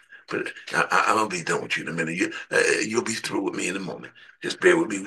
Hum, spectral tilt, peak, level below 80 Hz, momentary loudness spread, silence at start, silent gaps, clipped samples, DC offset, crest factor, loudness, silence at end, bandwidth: none; -3.5 dB/octave; -4 dBFS; -72 dBFS; 12 LU; 0.1 s; none; under 0.1%; under 0.1%; 20 dB; -24 LUFS; 0 s; 12.5 kHz